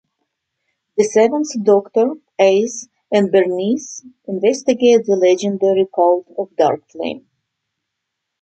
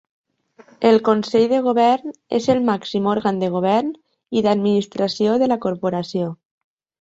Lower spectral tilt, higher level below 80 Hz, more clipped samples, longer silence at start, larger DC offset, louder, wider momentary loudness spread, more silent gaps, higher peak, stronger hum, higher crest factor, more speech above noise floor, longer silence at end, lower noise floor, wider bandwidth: second, -5 dB/octave vs -6.5 dB/octave; second, -68 dBFS vs -62 dBFS; neither; first, 0.95 s vs 0.8 s; neither; first, -16 LUFS vs -19 LUFS; first, 13 LU vs 8 LU; neither; about the same, -2 dBFS vs -2 dBFS; neither; about the same, 16 dB vs 18 dB; first, 62 dB vs 33 dB; first, 1.25 s vs 0.7 s; first, -78 dBFS vs -51 dBFS; about the same, 8.8 kHz vs 8 kHz